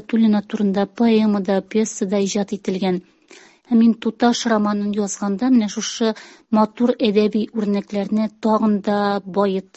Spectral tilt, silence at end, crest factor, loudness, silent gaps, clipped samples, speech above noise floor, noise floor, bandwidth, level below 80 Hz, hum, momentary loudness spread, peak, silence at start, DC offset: -5.5 dB/octave; 0.15 s; 16 dB; -19 LUFS; none; under 0.1%; 29 dB; -48 dBFS; 8.2 kHz; -62 dBFS; none; 6 LU; -4 dBFS; 0.1 s; under 0.1%